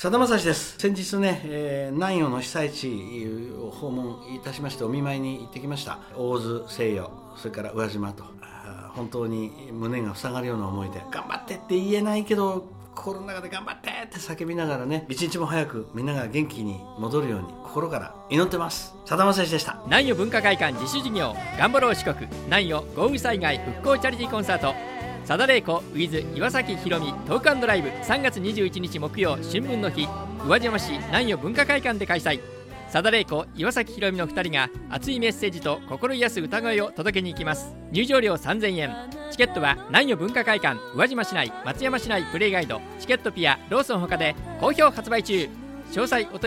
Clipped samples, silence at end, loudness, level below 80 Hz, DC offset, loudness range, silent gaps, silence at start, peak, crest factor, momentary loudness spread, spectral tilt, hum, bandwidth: under 0.1%; 0 s; -25 LUFS; -50 dBFS; under 0.1%; 8 LU; none; 0 s; -2 dBFS; 24 dB; 13 LU; -4.5 dB/octave; none; 16.5 kHz